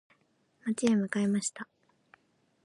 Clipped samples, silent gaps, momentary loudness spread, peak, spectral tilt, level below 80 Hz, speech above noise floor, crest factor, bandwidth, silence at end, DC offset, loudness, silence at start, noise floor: under 0.1%; none; 17 LU; -12 dBFS; -5 dB/octave; -78 dBFS; 42 dB; 20 dB; 11.5 kHz; 1 s; under 0.1%; -30 LUFS; 0.65 s; -71 dBFS